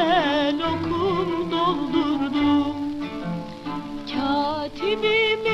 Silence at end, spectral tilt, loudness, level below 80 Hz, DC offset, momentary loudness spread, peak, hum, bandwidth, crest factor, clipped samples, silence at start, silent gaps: 0 s; -6 dB/octave; -23 LUFS; -48 dBFS; under 0.1%; 11 LU; -8 dBFS; none; 8.2 kHz; 16 dB; under 0.1%; 0 s; none